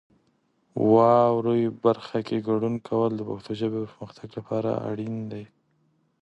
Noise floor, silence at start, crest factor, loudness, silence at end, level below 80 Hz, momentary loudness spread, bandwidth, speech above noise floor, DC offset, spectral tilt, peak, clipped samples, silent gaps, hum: -68 dBFS; 0.75 s; 20 dB; -25 LUFS; 0.75 s; -66 dBFS; 19 LU; 8.2 kHz; 44 dB; under 0.1%; -9 dB/octave; -6 dBFS; under 0.1%; none; none